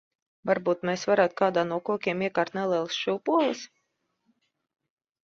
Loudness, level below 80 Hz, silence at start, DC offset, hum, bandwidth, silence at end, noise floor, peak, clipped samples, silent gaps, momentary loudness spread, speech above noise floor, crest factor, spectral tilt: -26 LUFS; -72 dBFS; 0.45 s; under 0.1%; none; 7.6 kHz; 1.6 s; -77 dBFS; -8 dBFS; under 0.1%; none; 5 LU; 51 dB; 20 dB; -5 dB/octave